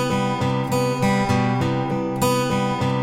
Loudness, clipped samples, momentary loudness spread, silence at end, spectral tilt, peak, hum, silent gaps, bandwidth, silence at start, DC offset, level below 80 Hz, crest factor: -21 LUFS; under 0.1%; 3 LU; 0 s; -6 dB/octave; -6 dBFS; none; none; 16.5 kHz; 0 s; under 0.1%; -46 dBFS; 14 dB